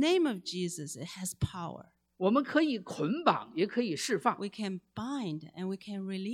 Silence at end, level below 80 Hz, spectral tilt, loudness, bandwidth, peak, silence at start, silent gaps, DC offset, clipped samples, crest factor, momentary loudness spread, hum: 0 s; -60 dBFS; -5 dB/octave; -33 LUFS; 16 kHz; -8 dBFS; 0 s; none; under 0.1%; under 0.1%; 24 dB; 11 LU; none